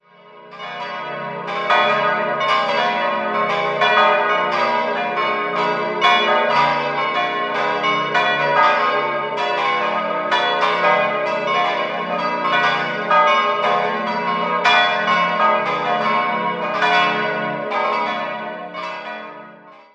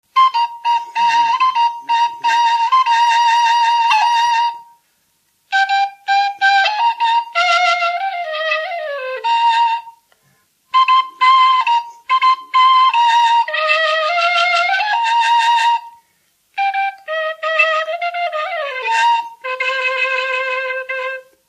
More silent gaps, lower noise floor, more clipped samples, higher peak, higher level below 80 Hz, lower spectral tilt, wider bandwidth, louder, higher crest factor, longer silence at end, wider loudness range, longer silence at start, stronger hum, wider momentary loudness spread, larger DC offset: neither; second, -43 dBFS vs -62 dBFS; neither; about the same, -2 dBFS vs 0 dBFS; first, -70 dBFS vs -78 dBFS; first, -4 dB/octave vs 2 dB/octave; second, 9 kHz vs 12 kHz; second, -18 LUFS vs -15 LUFS; about the same, 18 dB vs 16 dB; about the same, 0.2 s vs 0.3 s; about the same, 3 LU vs 5 LU; about the same, 0.25 s vs 0.15 s; neither; first, 12 LU vs 9 LU; neither